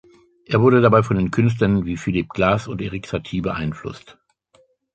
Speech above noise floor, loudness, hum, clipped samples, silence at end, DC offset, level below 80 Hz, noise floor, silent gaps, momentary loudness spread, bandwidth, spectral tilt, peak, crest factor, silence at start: 40 dB; -19 LUFS; none; under 0.1%; 0.85 s; under 0.1%; -44 dBFS; -59 dBFS; none; 13 LU; 8.6 kHz; -7.5 dB/octave; -2 dBFS; 18 dB; 0.5 s